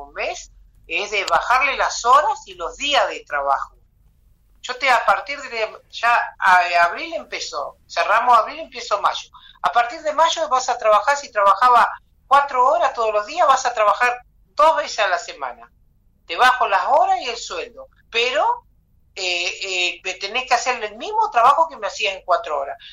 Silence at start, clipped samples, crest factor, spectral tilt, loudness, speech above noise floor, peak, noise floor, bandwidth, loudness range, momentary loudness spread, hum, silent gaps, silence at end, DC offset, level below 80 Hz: 0 s; under 0.1%; 14 dB; -0.5 dB/octave; -18 LUFS; 38 dB; -6 dBFS; -57 dBFS; 15.5 kHz; 4 LU; 13 LU; none; none; 0 s; under 0.1%; -54 dBFS